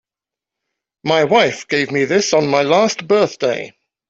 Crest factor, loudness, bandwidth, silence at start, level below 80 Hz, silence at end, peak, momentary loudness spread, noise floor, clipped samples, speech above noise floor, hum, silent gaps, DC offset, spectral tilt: 14 dB; -15 LUFS; 8 kHz; 1.05 s; -60 dBFS; 0.4 s; -2 dBFS; 7 LU; -87 dBFS; under 0.1%; 72 dB; none; none; under 0.1%; -4 dB/octave